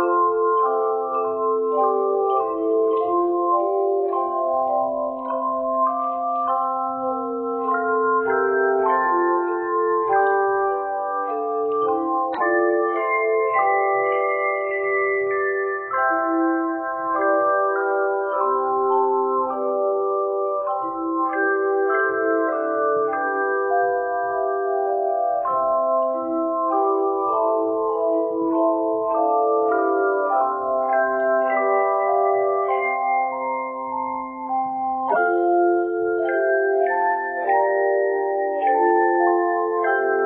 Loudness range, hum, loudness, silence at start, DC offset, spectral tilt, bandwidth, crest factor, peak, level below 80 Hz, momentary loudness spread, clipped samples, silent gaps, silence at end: 2 LU; none; -21 LUFS; 0 s; under 0.1%; -9.5 dB/octave; 3.9 kHz; 14 dB; -6 dBFS; -66 dBFS; 5 LU; under 0.1%; none; 0 s